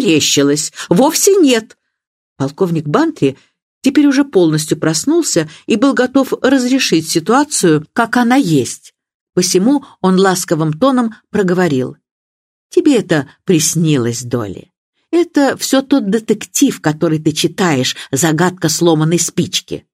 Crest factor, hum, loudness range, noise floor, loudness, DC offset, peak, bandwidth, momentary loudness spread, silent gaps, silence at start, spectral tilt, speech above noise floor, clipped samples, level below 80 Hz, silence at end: 14 dB; none; 2 LU; under -90 dBFS; -13 LUFS; under 0.1%; 0 dBFS; 16 kHz; 7 LU; 2.07-2.36 s, 3.62-3.81 s, 9.14-9.27 s, 12.11-12.70 s, 14.78-14.93 s; 0 s; -4.5 dB/octave; over 77 dB; under 0.1%; -58 dBFS; 0.15 s